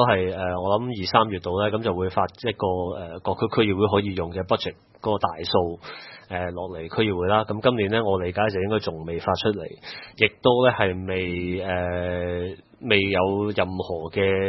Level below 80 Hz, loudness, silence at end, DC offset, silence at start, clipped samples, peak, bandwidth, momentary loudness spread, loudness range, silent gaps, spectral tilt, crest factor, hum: -56 dBFS; -24 LUFS; 0 s; under 0.1%; 0 s; under 0.1%; 0 dBFS; 6 kHz; 11 LU; 2 LU; none; -8 dB/octave; 24 dB; none